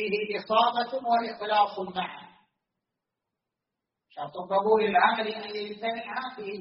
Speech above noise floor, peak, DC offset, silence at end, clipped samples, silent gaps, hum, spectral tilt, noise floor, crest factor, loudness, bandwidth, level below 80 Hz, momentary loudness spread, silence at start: 59 dB; -8 dBFS; under 0.1%; 0 s; under 0.1%; none; none; -1.5 dB/octave; -86 dBFS; 20 dB; -27 LUFS; 5.8 kHz; -74 dBFS; 14 LU; 0 s